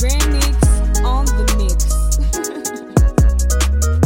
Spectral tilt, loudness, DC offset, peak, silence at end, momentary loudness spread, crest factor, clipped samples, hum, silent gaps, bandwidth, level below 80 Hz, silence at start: -5 dB/octave; -17 LUFS; under 0.1%; 0 dBFS; 0 s; 5 LU; 12 dB; under 0.1%; none; none; 16.5 kHz; -14 dBFS; 0 s